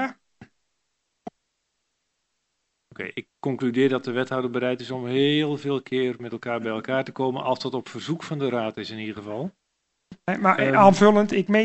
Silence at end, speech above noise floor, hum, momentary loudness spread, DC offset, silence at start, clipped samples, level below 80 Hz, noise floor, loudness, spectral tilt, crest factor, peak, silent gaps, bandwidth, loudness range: 0 s; 54 dB; none; 17 LU; under 0.1%; 0 s; under 0.1%; -68 dBFS; -77 dBFS; -23 LUFS; -6 dB/octave; 22 dB; -2 dBFS; none; 8.2 kHz; 10 LU